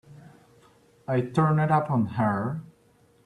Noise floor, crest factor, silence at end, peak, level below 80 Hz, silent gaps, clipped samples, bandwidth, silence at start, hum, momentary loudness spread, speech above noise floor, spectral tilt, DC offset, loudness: -61 dBFS; 18 dB; 0.65 s; -10 dBFS; -62 dBFS; none; under 0.1%; 10.5 kHz; 0.1 s; none; 11 LU; 37 dB; -9 dB/octave; under 0.1%; -25 LUFS